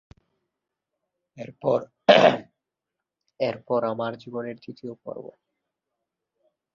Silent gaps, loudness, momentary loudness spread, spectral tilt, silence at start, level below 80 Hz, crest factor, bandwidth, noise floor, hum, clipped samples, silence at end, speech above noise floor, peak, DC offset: none; -23 LUFS; 22 LU; -5.5 dB/octave; 1.35 s; -68 dBFS; 26 dB; 7.4 kHz; -86 dBFS; none; under 0.1%; 1.5 s; 62 dB; -2 dBFS; under 0.1%